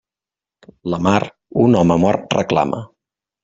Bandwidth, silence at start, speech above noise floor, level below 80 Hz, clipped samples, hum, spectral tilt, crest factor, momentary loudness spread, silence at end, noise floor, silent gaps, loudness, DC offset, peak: 7.8 kHz; 0.85 s; 74 dB; -50 dBFS; under 0.1%; none; -7 dB/octave; 18 dB; 11 LU; 0.6 s; -89 dBFS; none; -17 LUFS; under 0.1%; -2 dBFS